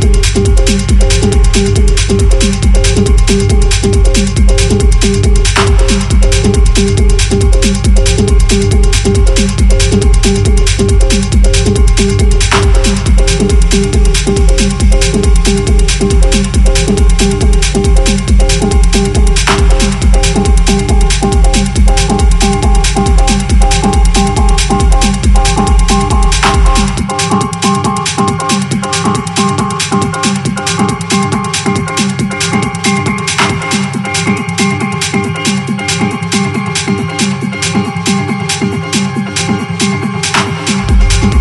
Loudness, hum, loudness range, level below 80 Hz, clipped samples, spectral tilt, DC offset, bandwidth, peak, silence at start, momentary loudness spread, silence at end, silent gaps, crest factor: -10 LUFS; none; 3 LU; -10 dBFS; under 0.1%; -4.5 dB/octave; under 0.1%; 12 kHz; 0 dBFS; 0 s; 4 LU; 0 s; none; 8 dB